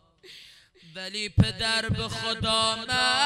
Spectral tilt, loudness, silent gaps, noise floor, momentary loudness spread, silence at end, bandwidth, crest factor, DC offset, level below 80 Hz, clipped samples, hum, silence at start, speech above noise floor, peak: -3.5 dB/octave; -25 LUFS; none; -53 dBFS; 22 LU; 0 s; 13.5 kHz; 22 dB; under 0.1%; -44 dBFS; under 0.1%; none; 0.25 s; 27 dB; -4 dBFS